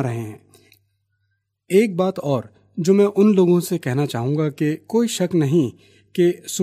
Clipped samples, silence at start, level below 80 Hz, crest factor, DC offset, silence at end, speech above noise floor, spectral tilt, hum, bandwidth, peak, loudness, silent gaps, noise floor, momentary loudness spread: under 0.1%; 0 s; -64 dBFS; 16 dB; under 0.1%; 0 s; 53 dB; -6.5 dB/octave; none; 15.5 kHz; -4 dBFS; -19 LUFS; none; -71 dBFS; 11 LU